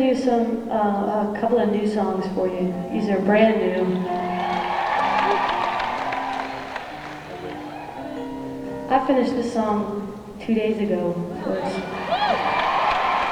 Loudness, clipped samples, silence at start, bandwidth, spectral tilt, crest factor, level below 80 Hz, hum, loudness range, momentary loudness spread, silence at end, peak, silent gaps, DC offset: -23 LUFS; under 0.1%; 0 s; 12.5 kHz; -6.5 dB/octave; 18 dB; -52 dBFS; none; 5 LU; 12 LU; 0 s; -4 dBFS; none; under 0.1%